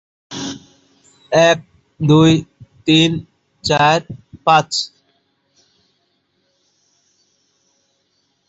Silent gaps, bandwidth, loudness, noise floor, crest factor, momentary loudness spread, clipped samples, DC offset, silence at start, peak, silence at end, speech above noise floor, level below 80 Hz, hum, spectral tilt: none; 8 kHz; -15 LUFS; -65 dBFS; 18 dB; 17 LU; under 0.1%; under 0.1%; 0.3 s; 0 dBFS; 3.6 s; 52 dB; -52 dBFS; none; -5 dB/octave